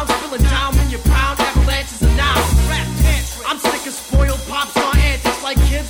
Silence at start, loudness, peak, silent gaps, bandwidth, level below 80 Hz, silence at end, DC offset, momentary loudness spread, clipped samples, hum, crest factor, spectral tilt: 0 s; -17 LUFS; -2 dBFS; none; 18.5 kHz; -18 dBFS; 0 s; under 0.1%; 4 LU; under 0.1%; none; 14 dB; -4.5 dB/octave